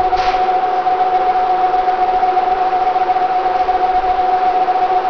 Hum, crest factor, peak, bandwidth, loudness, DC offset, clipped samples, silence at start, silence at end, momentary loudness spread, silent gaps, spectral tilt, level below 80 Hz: none; 8 dB; -6 dBFS; 5.4 kHz; -15 LUFS; 1%; under 0.1%; 0 s; 0 s; 1 LU; none; -5 dB/octave; -38 dBFS